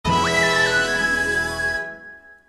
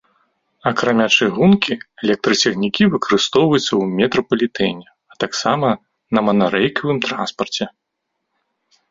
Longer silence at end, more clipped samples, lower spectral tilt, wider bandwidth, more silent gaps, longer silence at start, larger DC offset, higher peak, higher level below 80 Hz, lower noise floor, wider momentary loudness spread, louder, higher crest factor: second, 0.15 s vs 1.2 s; neither; second, -3 dB/octave vs -4.5 dB/octave; first, 14.5 kHz vs 7.8 kHz; neither; second, 0.05 s vs 0.65 s; neither; second, -6 dBFS vs 0 dBFS; first, -42 dBFS vs -54 dBFS; second, -43 dBFS vs -76 dBFS; about the same, 11 LU vs 9 LU; about the same, -19 LUFS vs -17 LUFS; about the same, 16 dB vs 18 dB